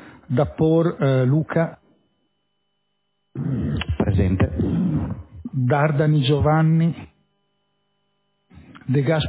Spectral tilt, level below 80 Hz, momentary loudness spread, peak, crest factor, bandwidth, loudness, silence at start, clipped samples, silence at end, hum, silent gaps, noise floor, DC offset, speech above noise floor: -12 dB/octave; -36 dBFS; 12 LU; -6 dBFS; 16 dB; 4 kHz; -21 LUFS; 0 s; under 0.1%; 0 s; none; none; -74 dBFS; under 0.1%; 56 dB